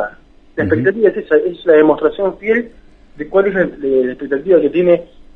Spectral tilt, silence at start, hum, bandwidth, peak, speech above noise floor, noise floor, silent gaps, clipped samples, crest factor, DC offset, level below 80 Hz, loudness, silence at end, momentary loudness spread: -9 dB/octave; 0 s; none; 4.1 kHz; 0 dBFS; 26 dB; -40 dBFS; none; under 0.1%; 14 dB; under 0.1%; -46 dBFS; -14 LUFS; 0.3 s; 10 LU